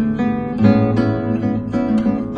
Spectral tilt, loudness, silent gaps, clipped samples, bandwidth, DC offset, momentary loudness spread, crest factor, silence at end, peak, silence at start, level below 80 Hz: -9.5 dB/octave; -17 LUFS; none; under 0.1%; 6.6 kHz; under 0.1%; 6 LU; 16 dB; 0 s; 0 dBFS; 0 s; -40 dBFS